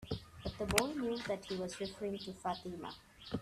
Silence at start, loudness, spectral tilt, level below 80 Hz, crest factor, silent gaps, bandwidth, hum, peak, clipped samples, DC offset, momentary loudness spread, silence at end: 0 s; -40 LUFS; -4 dB/octave; -58 dBFS; 30 dB; none; 15 kHz; none; -10 dBFS; under 0.1%; under 0.1%; 13 LU; 0 s